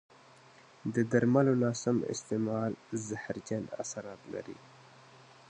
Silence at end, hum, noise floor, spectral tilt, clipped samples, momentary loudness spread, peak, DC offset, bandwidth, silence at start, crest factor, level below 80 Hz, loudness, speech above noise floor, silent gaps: 0.85 s; none; -58 dBFS; -6.5 dB/octave; under 0.1%; 16 LU; -12 dBFS; under 0.1%; 9.6 kHz; 0.85 s; 20 dB; -70 dBFS; -33 LUFS; 26 dB; none